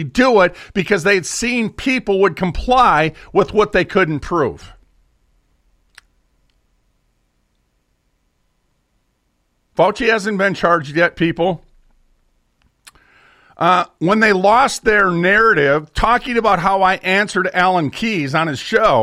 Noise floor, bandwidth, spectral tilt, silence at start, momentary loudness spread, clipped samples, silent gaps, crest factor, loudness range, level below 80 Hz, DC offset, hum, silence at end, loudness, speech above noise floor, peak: -65 dBFS; 14.5 kHz; -5 dB/octave; 0 s; 7 LU; under 0.1%; none; 16 dB; 8 LU; -38 dBFS; under 0.1%; none; 0 s; -15 LUFS; 50 dB; -2 dBFS